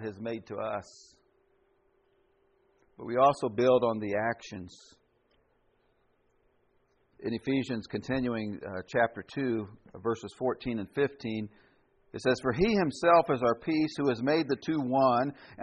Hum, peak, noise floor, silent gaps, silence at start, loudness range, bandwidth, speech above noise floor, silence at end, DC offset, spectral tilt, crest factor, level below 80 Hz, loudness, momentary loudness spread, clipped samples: none; -10 dBFS; -70 dBFS; none; 0 s; 11 LU; 8.4 kHz; 41 dB; 0 s; under 0.1%; -6.5 dB/octave; 20 dB; -60 dBFS; -30 LUFS; 14 LU; under 0.1%